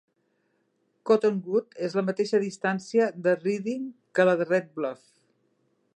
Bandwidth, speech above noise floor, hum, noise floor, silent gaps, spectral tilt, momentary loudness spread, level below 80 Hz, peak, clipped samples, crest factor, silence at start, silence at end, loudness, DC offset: 9.2 kHz; 47 dB; none; -72 dBFS; none; -6 dB/octave; 10 LU; -82 dBFS; -8 dBFS; under 0.1%; 20 dB; 1.05 s; 1 s; -26 LUFS; under 0.1%